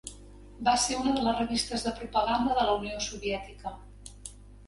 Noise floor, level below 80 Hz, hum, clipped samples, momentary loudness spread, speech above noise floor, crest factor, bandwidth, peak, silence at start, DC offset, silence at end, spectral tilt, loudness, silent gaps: -49 dBFS; -48 dBFS; 50 Hz at -45 dBFS; under 0.1%; 19 LU; 20 dB; 18 dB; 11.5 kHz; -12 dBFS; 0.05 s; under 0.1%; 0 s; -3 dB/octave; -29 LUFS; none